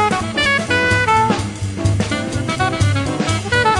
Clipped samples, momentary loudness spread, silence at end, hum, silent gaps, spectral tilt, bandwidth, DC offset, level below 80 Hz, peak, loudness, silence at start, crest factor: under 0.1%; 7 LU; 0 s; none; none; -4.5 dB/octave; 11.5 kHz; under 0.1%; -36 dBFS; -2 dBFS; -17 LUFS; 0 s; 14 dB